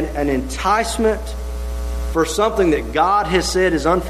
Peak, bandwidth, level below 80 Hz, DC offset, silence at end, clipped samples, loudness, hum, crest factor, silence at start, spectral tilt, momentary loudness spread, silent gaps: -2 dBFS; 13.5 kHz; -28 dBFS; under 0.1%; 0 s; under 0.1%; -18 LUFS; none; 16 dB; 0 s; -4.5 dB/octave; 10 LU; none